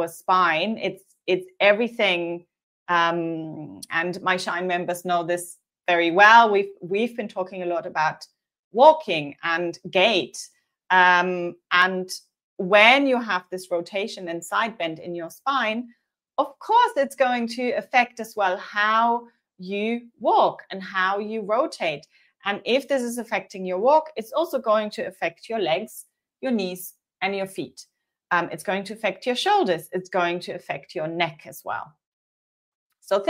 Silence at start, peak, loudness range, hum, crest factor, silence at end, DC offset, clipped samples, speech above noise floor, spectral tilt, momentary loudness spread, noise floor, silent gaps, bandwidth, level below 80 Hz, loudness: 0 s; 0 dBFS; 7 LU; none; 22 dB; 0 s; under 0.1%; under 0.1%; over 67 dB; -4 dB/octave; 15 LU; under -90 dBFS; 2.63-2.86 s, 8.59-8.71 s, 12.44-12.57 s, 32.07-32.90 s; 16 kHz; -76 dBFS; -22 LUFS